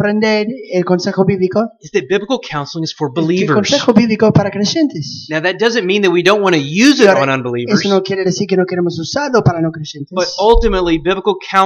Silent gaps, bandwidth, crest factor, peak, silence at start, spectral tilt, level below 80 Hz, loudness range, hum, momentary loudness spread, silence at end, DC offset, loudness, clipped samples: none; 11 kHz; 14 dB; 0 dBFS; 0 s; -5.5 dB/octave; -30 dBFS; 3 LU; none; 8 LU; 0 s; under 0.1%; -14 LUFS; under 0.1%